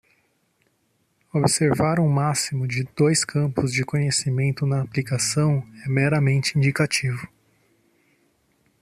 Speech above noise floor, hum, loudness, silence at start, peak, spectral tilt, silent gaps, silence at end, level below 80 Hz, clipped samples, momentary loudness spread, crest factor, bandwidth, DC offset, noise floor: 47 dB; none; -22 LUFS; 1.35 s; -6 dBFS; -5 dB/octave; none; 1.55 s; -56 dBFS; under 0.1%; 6 LU; 18 dB; 13 kHz; under 0.1%; -68 dBFS